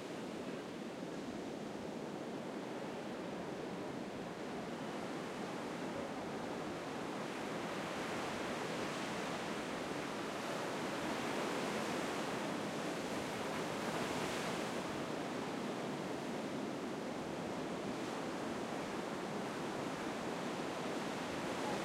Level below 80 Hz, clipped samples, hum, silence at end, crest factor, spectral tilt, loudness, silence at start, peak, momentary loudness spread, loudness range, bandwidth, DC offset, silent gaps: -72 dBFS; under 0.1%; none; 0 s; 16 dB; -4.5 dB/octave; -42 LUFS; 0 s; -26 dBFS; 6 LU; 5 LU; 16 kHz; under 0.1%; none